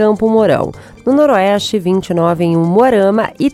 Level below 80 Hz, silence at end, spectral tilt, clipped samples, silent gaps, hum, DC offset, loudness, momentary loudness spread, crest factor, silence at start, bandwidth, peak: -46 dBFS; 0 s; -6.5 dB/octave; under 0.1%; none; none; under 0.1%; -12 LUFS; 5 LU; 12 dB; 0 s; 15 kHz; 0 dBFS